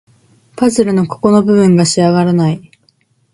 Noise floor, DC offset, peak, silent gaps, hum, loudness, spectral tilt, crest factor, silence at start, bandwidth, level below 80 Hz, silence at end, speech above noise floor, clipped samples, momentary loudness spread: -56 dBFS; under 0.1%; 0 dBFS; none; none; -11 LUFS; -6 dB/octave; 12 dB; 0.55 s; 11.5 kHz; -50 dBFS; 0.75 s; 46 dB; under 0.1%; 6 LU